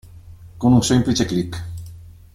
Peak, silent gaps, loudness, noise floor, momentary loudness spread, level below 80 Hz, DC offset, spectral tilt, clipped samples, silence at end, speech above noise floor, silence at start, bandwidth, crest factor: -2 dBFS; none; -18 LUFS; -41 dBFS; 20 LU; -42 dBFS; under 0.1%; -5.5 dB/octave; under 0.1%; 0.25 s; 24 dB; 0.05 s; 14 kHz; 18 dB